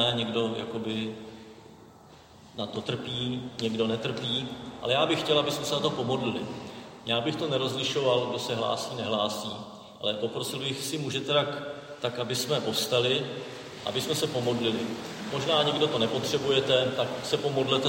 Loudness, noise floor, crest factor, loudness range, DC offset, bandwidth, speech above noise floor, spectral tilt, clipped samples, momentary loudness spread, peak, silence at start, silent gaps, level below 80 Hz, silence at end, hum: -28 LUFS; -52 dBFS; 20 dB; 6 LU; under 0.1%; 16.5 kHz; 24 dB; -4 dB/octave; under 0.1%; 12 LU; -10 dBFS; 0 s; none; -64 dBFS; 0 s; none